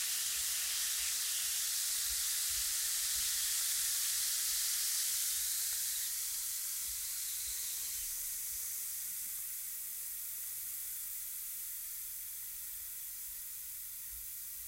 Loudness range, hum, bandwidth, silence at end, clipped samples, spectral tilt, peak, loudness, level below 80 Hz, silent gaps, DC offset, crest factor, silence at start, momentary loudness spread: 8 LU; none; 16 kHz; 0 s; under 0.1%; 3.5 dB/octave; -22 dBFS; -35 LUFS; -66 dBFS; none; under 0.1%; 16 dB; 0 s; 9 LU